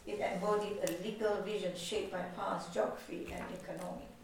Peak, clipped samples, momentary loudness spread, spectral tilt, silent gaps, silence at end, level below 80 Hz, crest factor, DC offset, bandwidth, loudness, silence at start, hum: -20 dBFS; under 0.1%; 9 LU; -4.5 dB/octave; none; 0 s; -62 dBFS; 18 dB; under 0.1%; 19 kHz; -38 LUFS; 0 s; none